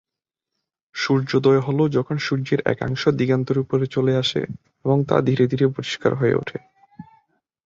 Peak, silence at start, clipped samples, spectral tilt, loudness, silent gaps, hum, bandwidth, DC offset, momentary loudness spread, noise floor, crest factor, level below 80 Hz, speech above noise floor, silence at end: -2 dBFS; 0.95 s; under 0.1%; -7 dB/octave; -21 LUFS; none; none; 7.6 kHz; under 0.1%; 9 LU; -86 dBFS; 18 dB; -56 dBFS; 66 dB; 0.65 s